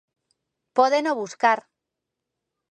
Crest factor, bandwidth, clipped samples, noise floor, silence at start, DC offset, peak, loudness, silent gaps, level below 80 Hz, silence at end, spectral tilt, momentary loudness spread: 22 dB; 9.6 kHz; under 0.1%; -84 dBFS; 0.75 s; under 0.1%; -4 dBFS; -22 LUFS; none; -82 dBFS; 1.1 s; -3 dB/octave; 7 LU